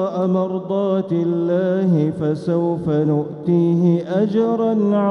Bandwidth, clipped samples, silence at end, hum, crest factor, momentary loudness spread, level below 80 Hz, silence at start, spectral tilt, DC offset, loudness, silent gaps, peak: 6.2 kHz; under 0.1%; 0 s; none; 12 dB; 4 LU; -58 dBFS; 0 s; -10 dB/octave; under 0.1%; -19 LUFS; none; -6 dBFS